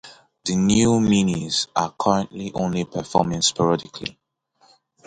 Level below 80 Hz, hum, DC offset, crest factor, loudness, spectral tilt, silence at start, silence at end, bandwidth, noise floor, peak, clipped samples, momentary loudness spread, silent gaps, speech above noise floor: -48 dBFS; none; under 0.1%; 20 dB; -21 LUFS; -4.5 dB/octave; 0.05 s; 0.95 s; 9.6 kHz; -61 dBFS; -2 dBFS; under 0.1%; 12 LU; none; 40 dB